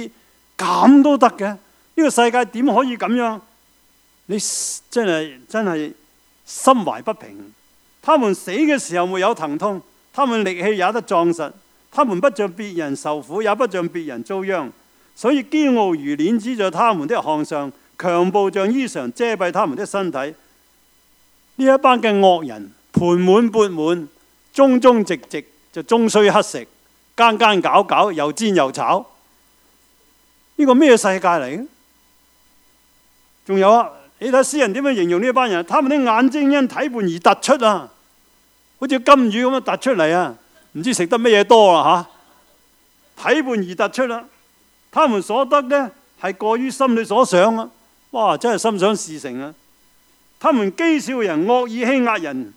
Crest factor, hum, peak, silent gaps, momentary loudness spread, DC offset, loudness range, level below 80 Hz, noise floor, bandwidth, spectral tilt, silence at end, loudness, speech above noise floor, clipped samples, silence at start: 18 dB; none; 0 dBFS; none; 14 LU; under 0.1%; 5 LU; -66 dBFS; -56 dBFS; 16.5 kHz; -4.5 dB/octave; 0.05 s; -17 LUFS; 40 dB; under 0.1%; 0 s